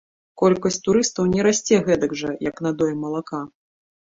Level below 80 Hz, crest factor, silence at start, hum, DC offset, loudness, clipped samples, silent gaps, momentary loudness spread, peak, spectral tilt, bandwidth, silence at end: -52 dBFS; 18 dB; 0.35 s; none; under 0.1%; -21 LUFS; under 0.1%; none; 10 LU; -4 dBFS; -5 dB/octave; 8 kHz; 0.7 s